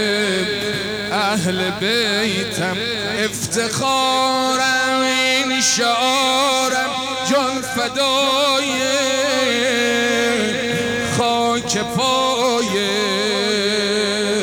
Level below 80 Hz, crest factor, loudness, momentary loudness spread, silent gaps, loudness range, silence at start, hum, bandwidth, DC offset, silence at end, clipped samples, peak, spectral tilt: -52 dBFS; 12 dB; -17 LUFS; 5 LU; none; 3 LU; 0 s; none; over 20 kHz; under 0.1%; 0 s; under 0.1%; -6 dBFS; -2.5 dB/octave